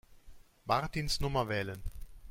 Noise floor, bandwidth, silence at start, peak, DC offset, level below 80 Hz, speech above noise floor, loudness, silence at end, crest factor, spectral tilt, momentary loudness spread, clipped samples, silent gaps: -54 dBFS; 16.5 kHz; 0.1 s; -14 dBFS; under 0.1%; -46 dBFS; 21 dB; -34 LUFS; 0 s; 20 dB; -4.5 dB/octave; 16 LU; under 0.1%; none